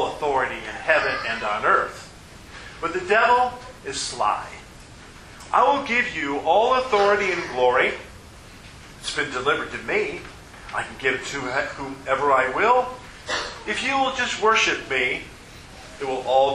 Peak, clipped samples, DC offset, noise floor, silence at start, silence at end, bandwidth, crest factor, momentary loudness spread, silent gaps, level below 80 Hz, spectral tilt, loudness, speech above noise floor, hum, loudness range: -4 dBFS; under 0.1%; under 0.1%; -43 dBFS; 0 s; 0 s; 12.5 kHz; 20 dB; 21 LU; none; -50 dBFS; -3 dB/octave; -22 LUFS; 22 dB; none; 5 LU